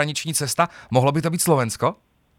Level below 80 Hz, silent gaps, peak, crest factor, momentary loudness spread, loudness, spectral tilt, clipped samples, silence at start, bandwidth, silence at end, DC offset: -58 dBFS; none; -2 dBFS; 18 dB; 4 LU; -21 LUFS; -4.5 dB/octave; under 0.1%; 0 s; 19.5 kHz; 0.45 s; under 0.1%